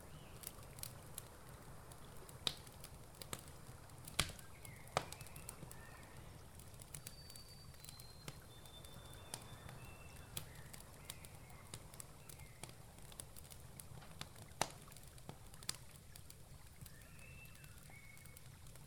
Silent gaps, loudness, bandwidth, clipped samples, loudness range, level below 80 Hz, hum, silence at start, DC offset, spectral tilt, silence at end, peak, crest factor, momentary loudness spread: none; -51 LUFS; over 20 kHz; under 0.1%; 7 LU; -64 dBFS; none; 0 s; under 0.1%; -2.5 dB/octave; 0 s; -16 dBFS; 38 dB; 13 LU